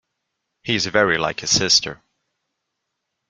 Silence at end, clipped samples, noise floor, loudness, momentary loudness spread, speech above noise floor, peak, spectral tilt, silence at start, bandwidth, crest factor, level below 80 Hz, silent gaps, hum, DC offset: 1.35 s; under 0.1%; -78 dBFS; -17 LUFS; 13 LU; 59 dB; -2 dBFS; -2 dB/octave; 0.65 s; 12 kHz; 20 dB; -54 dBFS; none; none; under 0.1%